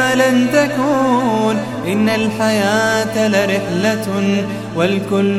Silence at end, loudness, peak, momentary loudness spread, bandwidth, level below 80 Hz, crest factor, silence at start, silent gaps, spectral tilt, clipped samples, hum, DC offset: 0 s; -15 LUFS; 0 dBFS; 5 LU; 15.5 kHz; -54 dBFS; 14 dB; 0 s; none; -5 dB/octave; under 0.1%; none; under 0.1%